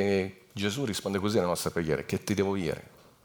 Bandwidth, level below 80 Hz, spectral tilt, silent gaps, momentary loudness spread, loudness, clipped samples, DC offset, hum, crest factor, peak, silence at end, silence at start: over 20 kHz; -58 dBFS; -5 dB/octave; none; 6 LU; -30 LUFS; under 0.1%; under 0.1%; none; 18 dB; -12 dBFS; 0.35 s; 0 s